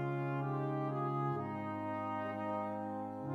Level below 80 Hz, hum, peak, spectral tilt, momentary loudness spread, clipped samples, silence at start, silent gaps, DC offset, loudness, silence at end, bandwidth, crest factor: -80 dBFS; none; -26 dBFS; -9.5 dB/octave; 4 LU; under 0.1%; 0 s; none; under 0.1%; -39 LUFS; 0 s; 4.8 kHz; 12 dB